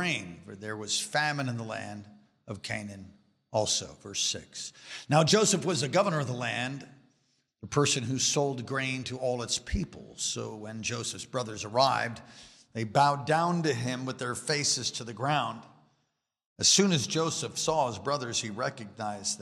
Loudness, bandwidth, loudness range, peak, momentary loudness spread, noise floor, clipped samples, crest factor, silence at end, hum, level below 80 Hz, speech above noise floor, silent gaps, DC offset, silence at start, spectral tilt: -29 LUFS; 15 kHz; 5 LU; -10 dBFS; 15 LU; -79 dBFS; under 0.1%; 22 dB; 0.05 s; none; -54 dBFS; 49 dB; 16.46-16.56 s; under 0.1%; 0 s; -3 dB/octave